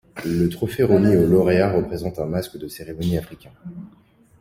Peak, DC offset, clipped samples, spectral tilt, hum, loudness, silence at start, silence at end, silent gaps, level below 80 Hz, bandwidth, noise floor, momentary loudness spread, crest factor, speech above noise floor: -4 dBFS; under 0.1%; under 0.1%; -7.5 dB/octave; none; -20 LUFS; 0.15 s; 0.55 s; none; -46 dBFS; 16 kHz; -54 dBFS; 23 LU; 18 dB; 34 dB